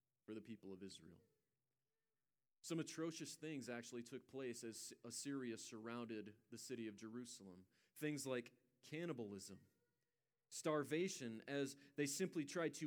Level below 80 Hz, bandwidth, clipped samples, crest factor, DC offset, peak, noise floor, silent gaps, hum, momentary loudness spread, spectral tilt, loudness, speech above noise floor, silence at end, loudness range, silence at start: under -90 dBFS; over 20 kHz; under 0.1%; 20 dB; under 0.1%; -30 dBFS; under -90 dBFS; none; none; 14 LU; -4 dB/octave; -49 LUFS; over 41 dB; 0 s; 5 LU; 0.3 s